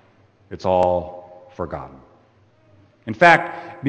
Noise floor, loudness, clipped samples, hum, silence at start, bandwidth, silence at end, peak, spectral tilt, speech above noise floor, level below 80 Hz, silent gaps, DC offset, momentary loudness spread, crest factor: -56 dBFS; -18 LUFS; under 0.1%; none; 0.5 s; 9 kHz; 0 s; 0 dBFS; -6 dB/octave; 37 dB; -52 dBFS; none; under 0.1%; 26 LU; 22 dB